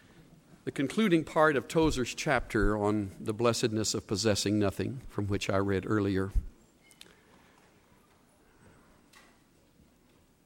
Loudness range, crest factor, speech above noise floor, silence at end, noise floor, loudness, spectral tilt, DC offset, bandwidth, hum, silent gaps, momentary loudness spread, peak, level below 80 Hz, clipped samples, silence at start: 8 LU; 22 dB; 35 dB; 3.95 s; -64 dBFS; -30 LUFS; -5 dB/octave; under 0.1%; 16.5 kHz; none; none; 10 LU; -10 dBFS; -44 dBFS; under 0.1%; 0.2 s